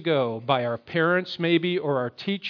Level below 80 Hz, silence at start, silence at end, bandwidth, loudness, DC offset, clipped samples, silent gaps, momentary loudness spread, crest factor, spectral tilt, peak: -70 dBFS; 0 s; 0 s; 5.4 kHz; -25 LUFS; under 0.1%; under 0.1%; none; 5 LU; 16 dB; -7.5 dB/octave; -8 dBFS